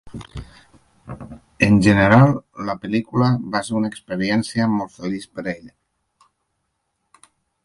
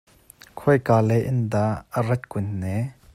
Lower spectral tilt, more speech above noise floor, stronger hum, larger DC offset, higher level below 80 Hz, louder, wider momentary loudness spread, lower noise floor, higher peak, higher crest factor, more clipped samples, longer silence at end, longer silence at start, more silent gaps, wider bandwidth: second, -7 dB/octave vs -8.5 dB/octave; first, 54 dB vs 29 dB; neither; neither; first, -46 dBFS vs -54 dBFS; first, -19 LUFS vs -23 LUFS; first, 24 LU vs 10 LU; first, -73 dBFS vs -51 dBFS; first, 0 dBFS vs -4 dBFS; about the same, 20 dB vs 18 dB; neither; first, 1.95 s vs 0.2 s; second, 0.05 s vs 0.55 s; neither; second, 11.5 kHz vs 14 kHz